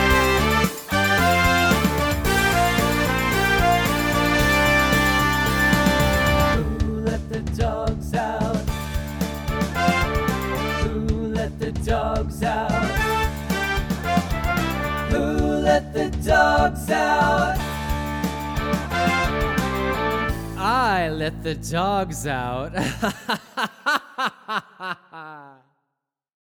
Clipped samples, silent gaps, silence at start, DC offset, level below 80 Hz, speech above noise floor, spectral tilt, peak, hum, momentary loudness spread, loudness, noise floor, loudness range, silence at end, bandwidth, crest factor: under 0.1%; none; 0 s; under 0.1%; -30 dBFS; 56 dB; -5 dB/octave; -4 dBFS; none; 9 LU; -21 LUFS; -81 dBFS; 7 LU; 0.95 s; over 20 kHz; 18 dB